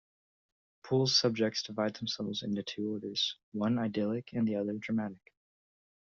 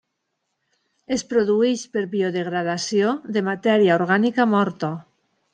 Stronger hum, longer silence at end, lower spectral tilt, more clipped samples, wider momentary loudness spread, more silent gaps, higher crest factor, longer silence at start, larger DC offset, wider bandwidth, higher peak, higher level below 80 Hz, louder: neither; first, 1.05 s vs 0.55 s; about the same, -4.5 dB/octave vs -5.5 dB/octave; neither; about the same, 9 LU vs 10 LU; first, 3.43-3.52 s vs none; about the same, 20 dB vs 18 dB; second, 0.85 s vs 1.1 s; neither; second, 7.4 kHz vs 9.8 kHz; second, -14 dBFS vs -4 dBFS; second, -74 dBFS vs -66 dBFS; second, -33 LUFS vs -21 LUFS